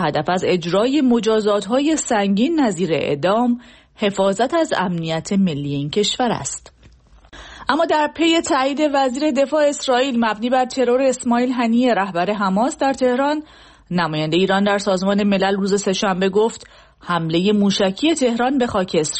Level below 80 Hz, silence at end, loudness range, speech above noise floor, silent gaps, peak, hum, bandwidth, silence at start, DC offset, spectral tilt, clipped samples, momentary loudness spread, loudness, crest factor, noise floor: -52 dBFS; 0 s; 2 LU; 30 dB; none; -2 dBFS; none; 8.8 kHz; 0 s; under 0.1%; -5 dB/octave; under 0.1%; 5 LU; -18 LUFS; 16 dB; -48 dBFS